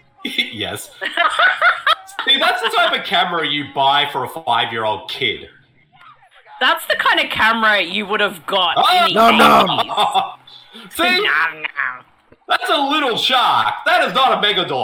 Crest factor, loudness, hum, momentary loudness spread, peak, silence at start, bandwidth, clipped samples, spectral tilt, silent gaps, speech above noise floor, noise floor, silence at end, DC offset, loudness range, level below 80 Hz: 16 dB; -15 LUFS; none; 9 LU; 0 dBFS; 0.25 s; 17.5 kHz; under 0.1%; -3 dB/octave; none; 33 dB; -49 dBFS; 0 s; under 0.1%; 5 LU; -56 dBFS